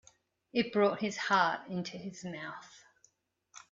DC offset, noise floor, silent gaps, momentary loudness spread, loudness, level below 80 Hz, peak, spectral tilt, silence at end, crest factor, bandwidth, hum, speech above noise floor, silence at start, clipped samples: under 0.1%; -72 dBFS; none; 14 LU; -33 LUFS; -76 dBFS; -14 dBFS; -4.5 dB/octave; 0.15 s; 22 dB; 7.8 kHz; none; 39 dB; 0.55 s; under 0.1%